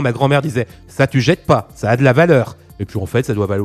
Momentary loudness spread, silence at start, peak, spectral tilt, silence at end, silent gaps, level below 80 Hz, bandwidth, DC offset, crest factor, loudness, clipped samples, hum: 14 LU; 0 s; 0 dBFS; -7 dB/octave; 0 s; none; -44 dBFS; 14 kHz; under 0.1%; 14 dB; -15 LUFS; under 0.1%; none